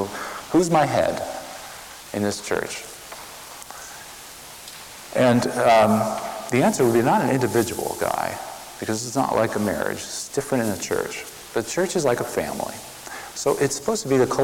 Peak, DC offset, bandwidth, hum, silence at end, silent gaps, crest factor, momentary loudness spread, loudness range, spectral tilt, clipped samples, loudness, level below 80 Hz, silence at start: -8 dBFS; under 0.1%; 18 kHz; none; 0 s; none; 16 dB; 18 LU; 10 LU; -4.5 dB/octave; under 0.1%; -22 LUFS; -54 dBFS; 0 s